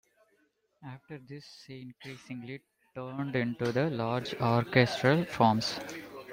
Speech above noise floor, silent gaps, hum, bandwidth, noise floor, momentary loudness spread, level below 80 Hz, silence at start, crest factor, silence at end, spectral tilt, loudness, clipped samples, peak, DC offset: 42 dB; none; none; 16 kHz; -72 dBFS; 21 LU; -66 dBFS; 0.8 s; 24 dB; 0 s; -6 dB/octave; -29 LUFS; under 0.1%; -8 dBFS; under 0.1%